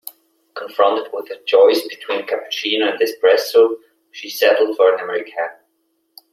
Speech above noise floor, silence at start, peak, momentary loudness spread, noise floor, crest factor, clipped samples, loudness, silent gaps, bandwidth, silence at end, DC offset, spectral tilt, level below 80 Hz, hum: 51 dB; 0.05 s; -2 dBFS; 15 LU; -67 dBFS; 16 dB; under 0.1%; -17 LUFS; none; 16 kHz; 0.8 s; under 0.1%; -2 dB/octave; -72 dBFS; none